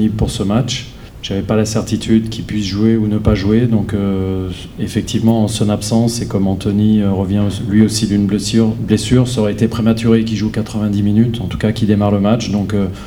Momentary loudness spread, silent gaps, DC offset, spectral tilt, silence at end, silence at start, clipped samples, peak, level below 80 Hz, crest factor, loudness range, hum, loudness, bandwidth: 7 LU; none; under 0.1%; -6.5 dB/octave; 0 s; 0 s; under 0.1%; 0 dBFS; -34 dBFS; 14 dB; 2 LU; none; -15 LUFS; 15.5 kHz